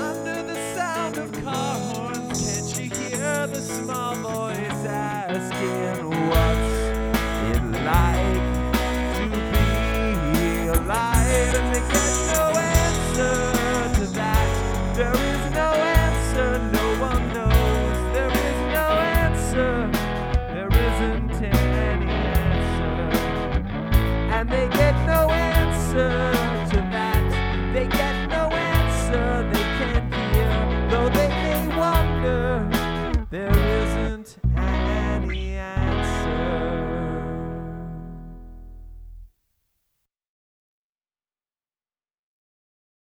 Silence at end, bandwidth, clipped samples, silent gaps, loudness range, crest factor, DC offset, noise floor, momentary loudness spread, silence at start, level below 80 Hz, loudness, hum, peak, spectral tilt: 3.75 s; 19.5 kHz; under 0.1%; none; 5 LU; 18 dB; under 0.1%; under -90 dBFS; 7 LU; 0 s; -26 dBFS; -23 LUFS; none; -4 dBFS; -5 dB/octave